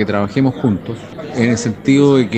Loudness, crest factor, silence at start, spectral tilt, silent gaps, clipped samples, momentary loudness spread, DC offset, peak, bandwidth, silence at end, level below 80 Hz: -15 LUFS; 14 dB; 0 s; -6.5 dB/octave; none; under 0.1%; 14 LU; under 0.1%; 0 dBFS; 8.8 kHz; 0 s; -48 dBFS